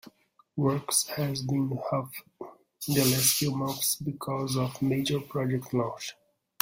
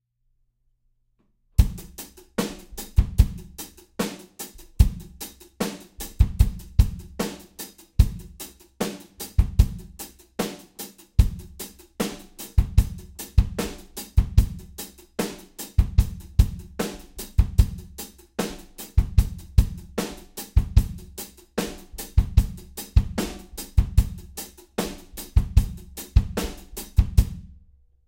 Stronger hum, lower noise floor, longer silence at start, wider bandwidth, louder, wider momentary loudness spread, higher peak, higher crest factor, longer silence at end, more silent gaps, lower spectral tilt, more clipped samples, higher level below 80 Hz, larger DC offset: neither; second, -57 dBFS vs -68 dBFS; second, 0.05 s vs 1.6 s; about the same, 16.5 kHz vs 17 kHz; about the same, -28 LUFS vs -26 LUFS; about the same, 17 LU vs 16 LU; second, -8 dBFS vs -2 dBFS; about the same, 22 dB vs 22 dB; about the same, 0.5 s vs 0.6 s; neither; second, -4 dB/octave vs -6 dB/octave; neither; second, -64 dBFS vs -26 dBFS; neither